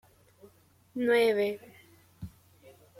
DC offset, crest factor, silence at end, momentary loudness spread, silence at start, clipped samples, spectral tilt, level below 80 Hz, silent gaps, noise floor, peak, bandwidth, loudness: under 0.1%; 18 dB; 0.3 s; 23 LU; 0.95 s; under 0.1%; -5 dB/octave; -66 dBFS; none; -61 dBFS; -14 dBFS; 16 kHz; -27 LUFS